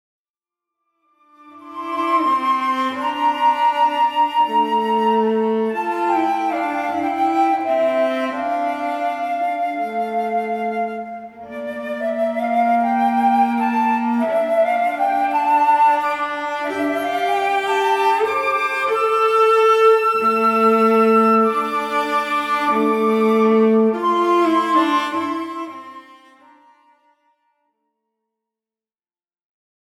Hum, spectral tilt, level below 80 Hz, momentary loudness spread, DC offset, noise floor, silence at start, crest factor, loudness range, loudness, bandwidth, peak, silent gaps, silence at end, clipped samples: none; -5 dB/octave; -68 dBFS; 9 LU; under 0.1%; under -90 dBFS; 1.45 s; 16 dB; 7 LU; -18 LUFS; 16 kHz; -4 dBFS; none; 4 s; under 0.1%